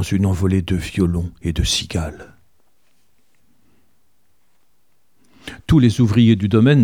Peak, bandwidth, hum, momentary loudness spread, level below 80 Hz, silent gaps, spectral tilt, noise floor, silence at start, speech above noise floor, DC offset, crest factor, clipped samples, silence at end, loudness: -2 dBFS; 15.5 kHz; none; 15 LU; -34 dBFS; none; -6 dB/octave; -67 dBFS; 0 s; 51 dB; 0.3%; 18 dB; under 0.1%; 0 s; -17 LUFS